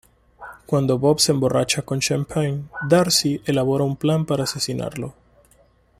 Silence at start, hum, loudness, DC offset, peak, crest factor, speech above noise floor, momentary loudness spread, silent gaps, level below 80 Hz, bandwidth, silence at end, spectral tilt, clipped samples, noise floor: 0.4 s; none; -20 LUFS; under 0.1%; -4 dBFS; 18 dB; 37 dB; 12 LU; none; -52 dBFS; 15.5 kHz; 0.9 s; -4.5 dB/octave; under 0.1%; -57 dBFS